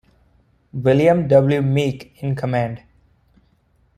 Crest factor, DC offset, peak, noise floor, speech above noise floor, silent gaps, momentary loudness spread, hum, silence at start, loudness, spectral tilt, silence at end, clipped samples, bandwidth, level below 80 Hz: 18 dB; under 0.1%; -2 dBFS; -60 dBFS; 43 dB; none; 13 LU; none; 0.75 s; -18 LUFS; -8 dB/octave; 1.2 s; under 0.1%; 10 kHz; -52 dBFS